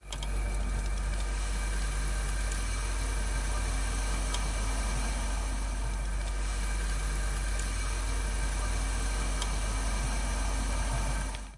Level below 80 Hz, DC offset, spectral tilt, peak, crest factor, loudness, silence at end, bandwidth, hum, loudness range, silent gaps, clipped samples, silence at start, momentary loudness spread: -32 dBFS; under 0.1%; -3.5 dB/octave; -18 dBFS; 14 dB; -33 LUFS; 0 s; 11.5 kHz; none; 1 LU; none; under 0.1%; 0.05 s; 2 LU